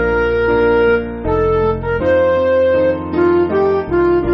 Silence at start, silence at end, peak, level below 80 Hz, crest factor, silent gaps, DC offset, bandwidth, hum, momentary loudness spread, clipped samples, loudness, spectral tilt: 0 s; 0 s; -2 dBFS; -32 dBFS; 10 dB; none; under 0.1%; 6 kHz; none; 4 LU; under 0.1%; -14 LUFS; -6 dB/octave